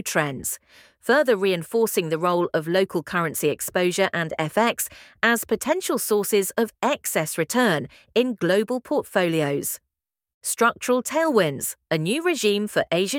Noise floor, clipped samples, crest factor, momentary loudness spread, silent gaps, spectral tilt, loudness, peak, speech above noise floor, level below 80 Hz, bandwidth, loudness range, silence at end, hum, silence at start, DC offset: -85 dBFS; under 0.1%; 20 dB; 6 LU; 10.34-10.41 s; -4 dB/octave; -23 LUFS; -4 dBFS; 62 dB; -64 dBFS; 18.5 kHz; 1 LU; 0 s; none; 0.05 s; under 0.1%